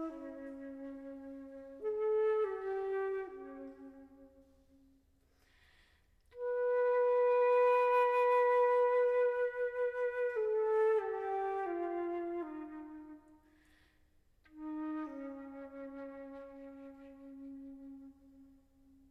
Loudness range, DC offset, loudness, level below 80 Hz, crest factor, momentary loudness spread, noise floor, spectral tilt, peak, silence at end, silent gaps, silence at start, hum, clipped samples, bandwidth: 17 LU; under 0.1%; -33 LUFS; -72 dBFS; 14 dB; 22 LU; -71 dBFS; -5.5 dB/octave; -22 dBFS; 0.65 s; none; 0 s; none; under 0.1%; 5.2 kHz